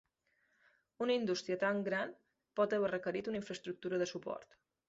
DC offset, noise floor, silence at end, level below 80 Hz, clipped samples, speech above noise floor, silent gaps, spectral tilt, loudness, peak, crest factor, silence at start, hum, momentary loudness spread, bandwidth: under 0.1%; -79 dBFS; 0.45 s; -78 dBFS; under 0.1%; 42 dB; none; -3.5 dB/octave; -38 LUFS; -22 dBFS; 18 dB; 1 s; none; 11 LU; 7.6 kHz